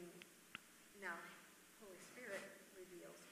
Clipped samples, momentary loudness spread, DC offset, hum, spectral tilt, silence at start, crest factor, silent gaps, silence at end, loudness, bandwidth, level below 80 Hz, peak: under 0.1%; 11 LU; under 0.1%; none; -2.5 dB/octave; 0 s; 24 dB; none; 0 s; -56 LUFS; 15.5 kHz; -90 dBFS; -32 dBFS